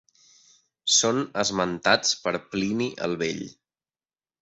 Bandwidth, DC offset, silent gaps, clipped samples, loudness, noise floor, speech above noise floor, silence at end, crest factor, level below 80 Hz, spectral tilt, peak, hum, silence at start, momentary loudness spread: 8.4 kHz; under 0.1%; none; under 0.1%; -24 LUFS; under -90 dBFS; over 64 dB; 0.9 s; 22 dB; -62 dBFS; -2.5 dB/octave; -6 dBFS; none; 0.85 s; 10 LU